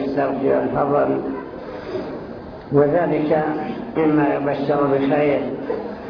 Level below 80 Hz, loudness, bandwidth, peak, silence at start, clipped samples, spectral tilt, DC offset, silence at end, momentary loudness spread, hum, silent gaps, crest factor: -50 dBFS; -20 LUFS; 5.4 kHz; -4 dBFS; 0 s; under 0.1%; -9.5 dB/octave; under 0.1%; 0 s; 13 LU; none; none; 16 dB